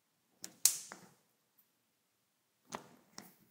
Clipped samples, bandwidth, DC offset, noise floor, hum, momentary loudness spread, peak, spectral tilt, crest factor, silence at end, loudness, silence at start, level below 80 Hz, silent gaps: under 0.1%; 16.5 kHz; under 0.1%; -80 dBFS; none; 24 LU; -2 dBFS; 1 dB/octave; 42 dB; 0.3 s; -32 LUFS; 0.45 s; under -90 dBFS; none